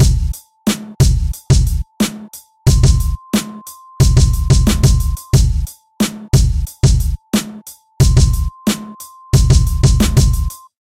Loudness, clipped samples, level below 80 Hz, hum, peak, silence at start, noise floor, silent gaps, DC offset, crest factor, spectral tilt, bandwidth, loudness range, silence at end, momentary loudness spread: -15 LUFS; under 0.1%; -16 dBFS; none; 0 dBFS; 0 s; -36 dBFS; none; under 0.1%; 14 dB; -5.5 dB/octave; 16.5 kHz; 2 LU; 0.25 s; 13 LU